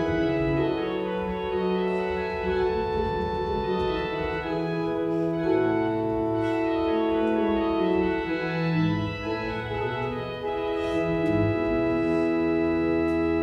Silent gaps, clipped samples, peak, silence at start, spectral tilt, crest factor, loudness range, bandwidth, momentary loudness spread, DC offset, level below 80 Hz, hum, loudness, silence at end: none; under 0.1%; -12 dBFS; 0 s; -8 dB/octave; 14 dB; 2 LU; 7 kHz; 5 LU; under 0.1%; -44 dBFS; none; -26 LUFS; 0 s